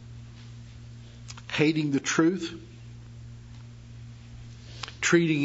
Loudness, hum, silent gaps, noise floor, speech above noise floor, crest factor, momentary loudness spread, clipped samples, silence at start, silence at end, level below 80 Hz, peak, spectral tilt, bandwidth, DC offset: -26 LUFS; none; none; -45 dBFS; 21 dB; 22 dB; 22 LU; under 0.1%; 0 s; 0 s; -54 dBFS; -8 dBFS; -4.5 dB/octave; 8 kHz; under 0.1%